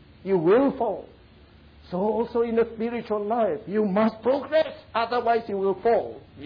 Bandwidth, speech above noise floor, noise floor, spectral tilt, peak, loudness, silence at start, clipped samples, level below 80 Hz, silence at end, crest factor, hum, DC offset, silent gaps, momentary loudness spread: 5.2 kHz; 28 dB; -52 dBFS; -9 dB/octave; -12 dBFS; -24 LUFS; 0.25 s; under 0.1%; -56 dBFS; 0 s; 14 dB; none; under 0.1%; none; 8 LU